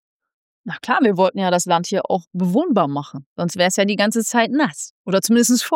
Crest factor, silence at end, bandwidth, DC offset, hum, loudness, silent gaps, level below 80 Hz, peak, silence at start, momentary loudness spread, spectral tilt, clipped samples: 14 dB; 0 s; 17 kHz; under 0.1%; none; -18 LUFS; 2.27-2.31 s, 3.26-3.36 s, 4.90-5.05 s; -74 dBFS; -4 dBFS; 0.65 s; 12 LU; -4 dB/octave; under 0.1%